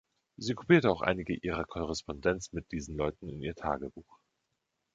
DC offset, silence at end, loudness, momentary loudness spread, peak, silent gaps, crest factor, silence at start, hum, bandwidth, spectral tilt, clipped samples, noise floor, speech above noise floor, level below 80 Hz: under 0.1%; 0.95 s; -32 LUFS; 14 LU; -10 dBFS; none; 24 dB; 0.4 s; none; 7.8 kHz; -6 dB/octave; under 0.1%; -83 dBFS; 51 dB; -52 dBFS